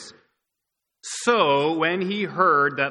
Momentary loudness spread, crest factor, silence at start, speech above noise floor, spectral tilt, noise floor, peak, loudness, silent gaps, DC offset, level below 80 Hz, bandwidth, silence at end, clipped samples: 9 LU; 18 dB; 0 s; 61 dB; -4 dB/octave; -82 dBFS; -6 dBFS; -21 LUFS; none; under 0.1%; -70 dBFS; 12 kHz; 0 s; under 0.1%